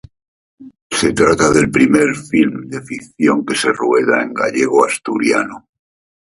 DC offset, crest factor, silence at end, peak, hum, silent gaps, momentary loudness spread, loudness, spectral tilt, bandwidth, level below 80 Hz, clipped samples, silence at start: under 0.1%; 16 dB; 0.65 s; 0 dBFS; none; 0.82-0.90 s; 10 LU; -14 LUFS; -4.5 dB/octave; 11.5 kHz; -46 dBFS; under 0.1%; 0.6 s